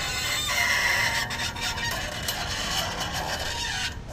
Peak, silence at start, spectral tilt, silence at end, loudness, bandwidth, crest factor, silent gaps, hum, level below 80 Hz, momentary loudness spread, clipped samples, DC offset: -12 dBFS; 0 s; -1.5 dB/octave; 0 s; -26 LUFS; 16 kHz; 16 dB; none; none; -42 dBFS; 7 LU; under 0.1%; under 0.1%